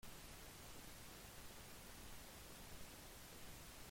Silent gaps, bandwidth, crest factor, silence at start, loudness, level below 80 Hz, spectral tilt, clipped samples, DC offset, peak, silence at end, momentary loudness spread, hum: none; 16.5 kHz; 14 dB; 0 s; -57 LUFS; -64 dBFS; -3 dB/octave; under 0.1%; under 0.1%; -42 dBFS; 0 s; 0 LU; none